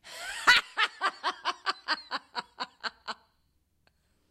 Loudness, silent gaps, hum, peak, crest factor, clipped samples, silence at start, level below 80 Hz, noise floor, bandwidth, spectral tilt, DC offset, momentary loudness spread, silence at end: -29 LUFS; none; none; -8 dBFS; 26 dB; under 0.1%; 0.05 s; -68 dBFS; -72 dBFS; 16 kHz; 0.5 dB/octave; under 0.1%; 19 LU; 1.15 s